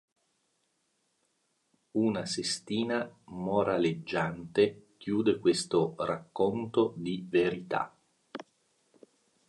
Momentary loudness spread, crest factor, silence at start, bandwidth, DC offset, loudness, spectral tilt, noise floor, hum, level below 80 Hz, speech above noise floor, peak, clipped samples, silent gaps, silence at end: 12 LU; 20 dB; 1.95 s; 11.5 kHz; under 0.1%; -31 LUFS; -5 dB/octave; -76 dBFS; none; -68 dBFS; 46 dB; -12 dBFS; under 0.1%; none; 1.05 s